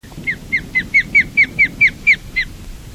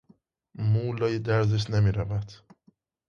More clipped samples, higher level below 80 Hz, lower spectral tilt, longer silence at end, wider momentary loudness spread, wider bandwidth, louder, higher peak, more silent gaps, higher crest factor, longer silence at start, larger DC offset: neither; first, -38 dBFS vs -48 dBFS; second, -3.5 dB/octave vs -7.5 dB/octave; second, 0 s vs 0.75 s; first, 11 LU vs 8 LU; first, 16 kHz vs 7 kHz; first, -13 LUFS vs -27 LUFS; first, -4 dBFS vs -10 dBFS; neither; about the same, 14 dB vs 16 dB; second, 0.05 s vs 0.6 s; first, 0.1% vs under 0.1%